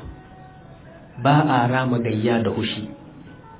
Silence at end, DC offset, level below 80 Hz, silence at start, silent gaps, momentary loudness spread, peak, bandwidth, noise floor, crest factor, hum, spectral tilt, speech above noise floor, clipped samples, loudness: 0 s; under 0.1%; -50 dBFS; 0 s; none; 24 LU; -4 dBFS; 4 kHz; -43 dBFS; 18 dB; none; -11 dB/octave; 24 dB; under 0.1%; -21 LUFS